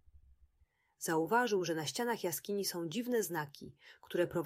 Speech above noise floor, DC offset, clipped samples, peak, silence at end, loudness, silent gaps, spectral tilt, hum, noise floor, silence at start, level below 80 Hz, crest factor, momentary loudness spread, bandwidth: 38 dB; under 0.1%; under 0.1%; -18 dBFS; 0 s; -36 LUFS; none; -4 dB/octave; none; -74 dBFS; 1 s; -72 dBFS; 20 dB; 11 LU; 16 kHz